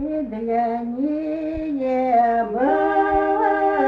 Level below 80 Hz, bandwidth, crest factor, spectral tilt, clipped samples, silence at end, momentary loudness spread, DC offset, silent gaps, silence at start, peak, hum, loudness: -46 dBFS; 6 kHz; 14 dB; -8 dB/octave; under 0.1%; 0 s; 8 LU; under 0.1%; none; 0 s; -6 dBFS; none; -21 LUFS